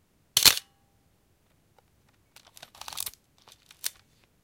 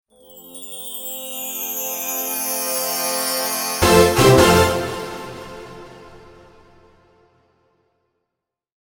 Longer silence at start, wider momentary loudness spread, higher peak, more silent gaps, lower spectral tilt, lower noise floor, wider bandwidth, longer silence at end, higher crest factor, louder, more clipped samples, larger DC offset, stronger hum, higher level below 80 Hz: about the same, 0.35 s vs 0.3 s; second, 20 LU vs 23 LU; about the same, 0 dBFS vs 0 dBFS; neither; second, 1 dB/octave vs -3.5 dB/octave; second, -67 dBFS vs -82 dBFS; second, 17 kHz vs 19 kHz; second, 0.55 s vs 2.65 s; first, 32 dB vs 20 dB; second, -24 LUFS vs -18 LUFS; neither; neither; neither; second, -62 dBFS vs -40 dBFS